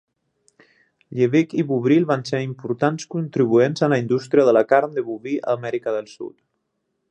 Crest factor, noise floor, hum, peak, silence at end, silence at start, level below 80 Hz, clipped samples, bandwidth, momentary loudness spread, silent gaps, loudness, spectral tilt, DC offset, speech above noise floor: 18 dB; -74 dBFS; none; -2 dBFS; 0.8 s; 1.1 s; -68 dBFS; under 0.1%; 9 kHz; 11 LU; none; -20 LUFS; -7 dB/octave; under 0.1%; 55 dB